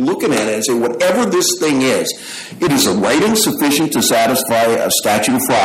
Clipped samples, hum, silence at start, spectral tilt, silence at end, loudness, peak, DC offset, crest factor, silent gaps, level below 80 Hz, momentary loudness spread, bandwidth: under 0.1%; none; 0 s; -3 dB/octave; 0 s; -14 LUFS; -2 dBFS; under 0.1%; 12 dB; none; -52 dBFS; 4 LU; 16.5 kHz